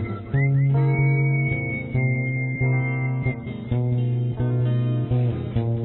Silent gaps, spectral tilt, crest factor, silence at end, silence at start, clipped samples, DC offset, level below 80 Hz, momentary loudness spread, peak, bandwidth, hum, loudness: none; -12.5 dB/octave; 12 dB; 0 s; 0 s; under 0.1%; under 0.1%; -44 dBFS; 6 LU; -10 dBFS; 3.9 kHz; none; -23 LUFS